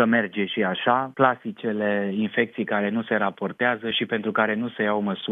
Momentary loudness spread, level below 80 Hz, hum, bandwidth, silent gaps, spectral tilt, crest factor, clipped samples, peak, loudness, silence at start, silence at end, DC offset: 4 LU; -74 dBFS; none; 3.9 kHz; none; -8.5 dB/octave; 20 dB; under 0.1%; -2 dBFS; -24 LUFS; 0 s; 0 s; under 0.1%